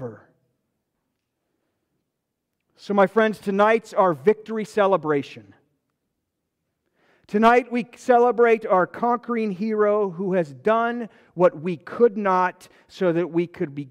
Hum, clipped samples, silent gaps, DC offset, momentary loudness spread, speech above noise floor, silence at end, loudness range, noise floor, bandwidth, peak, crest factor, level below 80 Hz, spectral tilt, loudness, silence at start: none; under 0.1%; none; under 0.1%; 10 LU; 59 dB; 0.05 s; 5 LU; -80 dBFS; 11.5 kHz; -6 dBFS; 16 dB; -66 dBFS; -7 dB/octave; -21 LUFS; 0 s